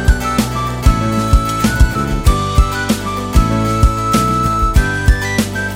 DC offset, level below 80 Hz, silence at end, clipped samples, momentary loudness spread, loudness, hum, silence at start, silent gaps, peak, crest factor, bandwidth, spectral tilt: under 0.1%; -16 dBFS; 0 s; under 0.1%; 3 LU; -15 LUFS; none; 0 s; none; 0 dBFS; 14 dB; 16.5 kHz; -5.5 dB/octave